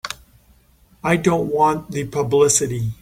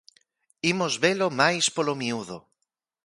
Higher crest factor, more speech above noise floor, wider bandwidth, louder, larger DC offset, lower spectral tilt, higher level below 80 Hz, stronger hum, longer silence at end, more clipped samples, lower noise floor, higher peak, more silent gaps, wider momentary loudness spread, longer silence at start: about the same, 18 dB vs 22 dB; second, 36 dB vs 56 dB; first, 16.5 kHz vs 11.5 kHz; first, -18 LUFS vs -24 LUFS; neither; first, -4.5 dB/octave vs -3 dB/octave; first, -48 dBFS vs -70 dBFS; neither; second, 0.05 s vs 0.65 s; neither; second, -54 dBFS vs -81 dBFS; about the same, -2 dBFS vs -4 dBFS; neither; about the same, 12 LU vs 13 LU; second, 0.05 s vs 0.65 s